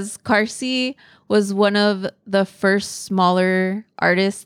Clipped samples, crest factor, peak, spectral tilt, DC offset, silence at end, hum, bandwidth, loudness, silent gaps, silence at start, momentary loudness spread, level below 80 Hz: under 0.1%; 16 dB; -4 dBFS; -5 dB/octave; under 0.1%; 0.05 s; none; 14.5 kHz; -19 LUFS; none; 0 s; 6 LU; -64 dBFS